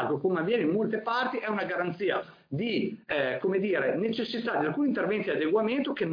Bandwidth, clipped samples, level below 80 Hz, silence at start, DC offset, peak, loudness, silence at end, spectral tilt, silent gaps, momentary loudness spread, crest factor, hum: 5.2 kHz; under 0.1%; -72 dBFS; 0 s; under 0.1%; -14 dBFS; -29 LUFS; 0 s; -8 dB/octave; none; 4 LU; 14 dB; none